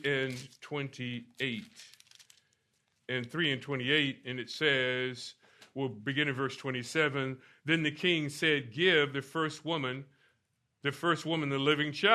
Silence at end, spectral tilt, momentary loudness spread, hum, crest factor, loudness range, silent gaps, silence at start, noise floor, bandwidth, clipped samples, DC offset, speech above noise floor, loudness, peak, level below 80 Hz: 0 s; -5 dB/octave; 12 LU; none; 24 dB; 7 LU; none; 0 s; -78 dBFS; 13.5 kHz; under 0.1%; under 0.1%; 46 dB; -32 LUFS; -8 dBFS; -76 dBFS